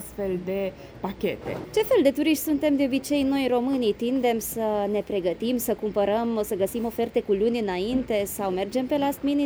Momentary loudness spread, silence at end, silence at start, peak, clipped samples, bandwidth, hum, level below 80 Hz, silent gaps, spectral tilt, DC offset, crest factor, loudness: 7 LU; 0 s; 0 s; -8 dBFS; under 0.1%; over 20 kHz; none; -52 dBFS; none; -5 dB/octave; under 0.1%; 16 dB; -25 LUFS